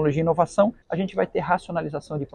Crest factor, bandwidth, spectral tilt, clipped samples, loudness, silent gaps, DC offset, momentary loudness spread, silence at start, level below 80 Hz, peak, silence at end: 18 dB; 9.8 kHz; -7.5 dB/octave; under 0.1%; -24 LUFS; none; under 0.1%; 8 LU; 0 s; -52 dBFS; -6 dBFS; 0.1 s